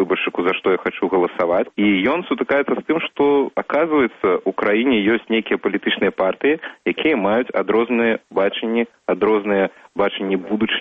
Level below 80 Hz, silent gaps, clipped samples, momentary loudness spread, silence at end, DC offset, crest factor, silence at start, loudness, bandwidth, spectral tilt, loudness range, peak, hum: -58 dBFS; none; under 0.1%; 5 LU; 0 s; under 0.1%; 14 dB; 0 s; -19 LUFS; 4.8 kHz; -7.5 dB/octave; 1 LU; -4 dBFS; none